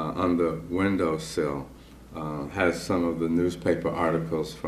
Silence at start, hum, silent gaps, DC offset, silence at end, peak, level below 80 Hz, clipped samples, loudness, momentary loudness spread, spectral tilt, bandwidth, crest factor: 0 s; none; none; under 0.1%; 0 s; -10 dBFS; -50 dBFS; under 0.1%; -27 LUFS; 10 LU; -6.5 dB/octave; 14 kHz; 16 dB